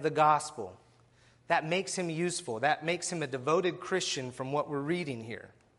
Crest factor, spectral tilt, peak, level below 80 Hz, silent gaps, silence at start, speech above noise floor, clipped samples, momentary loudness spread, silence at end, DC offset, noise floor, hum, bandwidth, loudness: 20 dB; -4 dB/octave; -12 dBFS; -72 dBFS; none; 0 s; 32 dB; under 0.1%; 13 LU; 0.3 s; under 0.1%; -63 dBFS; none; 11.5 kHz; -31 LUFS